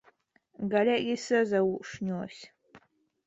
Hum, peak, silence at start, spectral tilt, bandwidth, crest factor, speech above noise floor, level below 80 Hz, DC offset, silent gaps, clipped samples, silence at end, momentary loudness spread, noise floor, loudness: none; -14 dBFS; 0.6 s; -5.5 dB/octave; 8.2 kHz; 18 dB; 38 dB; -70 dBFS; under 0.1%; none; under 0.1%; 0.5 s; 12 LU; -66 dBFS; -29 LUFS